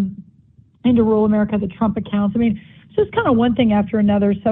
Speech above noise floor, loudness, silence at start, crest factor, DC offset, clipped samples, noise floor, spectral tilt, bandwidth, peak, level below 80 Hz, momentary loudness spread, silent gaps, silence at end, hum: 35 dB; -18 LUFS; 0 s; 16 dB; under 0.1%; under 0.1%; -51 dBFS; -11.5 dB/octave; 3.9 kHz; -2 dBFS; -44 dBFS; 6 LU; none; 0 s; none